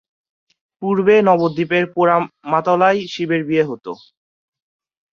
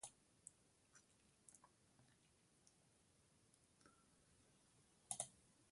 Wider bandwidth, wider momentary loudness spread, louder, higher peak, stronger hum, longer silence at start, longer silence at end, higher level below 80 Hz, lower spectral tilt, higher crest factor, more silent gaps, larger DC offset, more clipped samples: second, 7.2 kHz vs 11.5 kHz; second, 12 LU vs 18 LU; first, -16 LUFS vs -52 LUFS; first, -2 dBFS vs -28 dBFS; neither; first, 0.8 s vs 0 s; first, 1.2 s vs 0 s; first, -62 dBFS vs -88 dBFS; first, -7 dB/octave vs -1.5 dB/octave; second, 16 dB vs 34 dB; neither; neither; neither